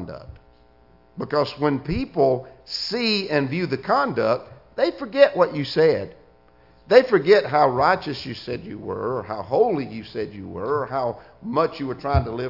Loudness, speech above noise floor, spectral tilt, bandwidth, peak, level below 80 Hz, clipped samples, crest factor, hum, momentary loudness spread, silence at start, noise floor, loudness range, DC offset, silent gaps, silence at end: -22 LUFS; 33 dB; -6.5 dB/octave; 5.8 kHz; 0 dBFS; -46 dBFS; under 0.1%; 22 dB; none; 14 LU; 0 s; -55 dBFS; 6 LU; under 0.1%; none; 0 s